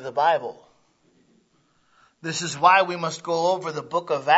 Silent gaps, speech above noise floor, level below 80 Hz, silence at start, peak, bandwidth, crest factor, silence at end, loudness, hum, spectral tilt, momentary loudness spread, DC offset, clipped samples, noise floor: none; 42 dB; -76 dBFS; 0 s; -2 dBFS; 8 kHz; 22 dB; 0 s; -22 LUFS; none; -3.5 dB/octave; 12 LU; under 0.1%; under 0.1%; -64 dBFS